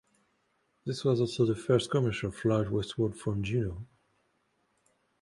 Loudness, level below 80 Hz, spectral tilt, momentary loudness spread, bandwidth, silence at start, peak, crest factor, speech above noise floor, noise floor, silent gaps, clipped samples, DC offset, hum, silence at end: -30 LUFS; -54 dBFS; -6.5 dB/octave; 10 LU; 11.5 kHz; 0.85 s; -12 dBFS; 20 dB; 45 dB; -74 dBFS; none; under 0.1%; under 0.1%; none; 1.35 s